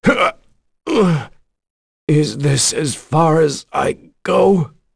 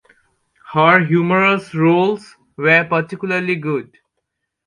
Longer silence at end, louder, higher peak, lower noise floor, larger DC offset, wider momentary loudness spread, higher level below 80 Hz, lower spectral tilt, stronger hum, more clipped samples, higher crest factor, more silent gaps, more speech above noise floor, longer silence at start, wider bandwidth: second, 0.3 s vs 0.85 s; about the same, -16 LUFS vs -16 LUFS; about the same, -2 dBFS vs 0 dBFS; second, -49 dBFS vs -75 dBFS; neither; about the same, 9 LU vs 10 LU; first, -46 dBFS vs -62 dBFS; second, -5 dB/octave vs -7.5 dB/octave; neither; neither; about the same, 14 dB vs 16 dB; first, 1.70-2.07 s vs none; second, 34 dB vs 60 dB; second, 0.05 s vs 0.7 s; about the same, 11 kHz vs 10.5 kHz